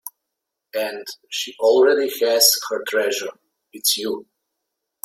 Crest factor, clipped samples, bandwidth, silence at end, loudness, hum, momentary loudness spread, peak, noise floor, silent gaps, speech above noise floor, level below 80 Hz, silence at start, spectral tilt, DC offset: 22 dB; under 0.1%; 16.5 kHz; 0.85 s; -19 LUFS; none; 16 LU; 0 dBFS; -81 dBFS; none; 61 dB; -72 dBFS; 0.05 s; 0 dB/octave; under 0.1%